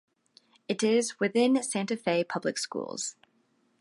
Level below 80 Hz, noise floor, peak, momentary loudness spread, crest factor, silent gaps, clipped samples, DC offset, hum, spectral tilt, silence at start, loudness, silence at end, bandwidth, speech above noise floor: -80 dBFS; -70 dBFS; -12 dBFS; 10 LU; 18 dB; none; under 0.1%; under 0.1%; none; -4 dB/octave; 0.7 s; -29 LUFS; 0.7 s; 11.5 kHz; 42 dB